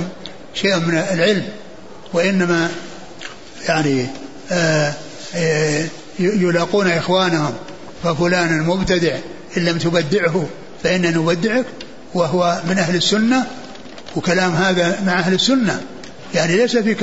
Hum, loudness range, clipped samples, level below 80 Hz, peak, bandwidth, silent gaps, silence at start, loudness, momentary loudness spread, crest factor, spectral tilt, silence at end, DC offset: none; 3 LU; under 0.1%; -48 dBFS; -2 dBFS; 8 kHz; none; 0 s; -18 LUFS; 17 LU; 16 dB; -5 dB/octave; 0 s; 1%